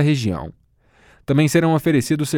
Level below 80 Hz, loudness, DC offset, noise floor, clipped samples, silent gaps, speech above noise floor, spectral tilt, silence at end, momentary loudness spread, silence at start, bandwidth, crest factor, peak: -48 dBFS; -18 LUFS; under 0.1%; -55 dBFS; under 0.1%; none; 38 dB; -6 dB/octave; 0 s; 17 LU; 0 s; 18 kHz; 16 dB; -4 dBFS